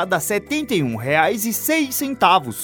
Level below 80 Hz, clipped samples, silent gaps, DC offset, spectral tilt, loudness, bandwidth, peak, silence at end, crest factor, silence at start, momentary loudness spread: -54 dBFS; under 0.1%; none; under 0.1%; -3.5 dB/octave; -19 LUFS; over 20 kHz; -2 dBFS; 0 s; 18 dB; 0 s; 5 LU